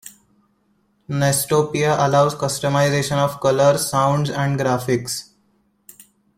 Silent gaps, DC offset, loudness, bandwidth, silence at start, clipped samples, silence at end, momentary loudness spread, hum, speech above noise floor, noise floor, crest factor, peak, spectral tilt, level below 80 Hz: none; under 0.1%; -19 LUFS; 16.5 kHz; 0.05 s; under 0.1%; 1.15 s; 6 LU; none; 45 dB; -63 dBFS; 16 dB; -4 dBFS; -5 dB/octave; -54 dBFS